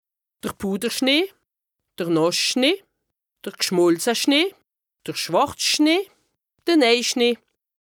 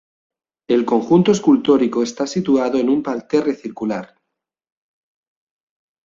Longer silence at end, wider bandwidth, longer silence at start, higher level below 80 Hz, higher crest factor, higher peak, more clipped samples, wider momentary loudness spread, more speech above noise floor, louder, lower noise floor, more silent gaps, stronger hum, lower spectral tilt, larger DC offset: second, 0.45 s vs 2 s; first, over 20 kHz vs 7.6 kHz; second, 0.45 s vs 0.7 s; about the same, -64 dBFS vs -60 dBFS; about the same, 16 dB vs 16 dB; second, -6 dBFS vs -2 dBFS; neither; first, 14 LU vs 10 LU; about the same, 62 dB vs 63 dB; second, -20 LUFS vs -17 LUFS; about the same, -82 dBFS vs -80 dBFS; neither; neither; second, -3 dB/octave vs -6.5 dB/octave; neither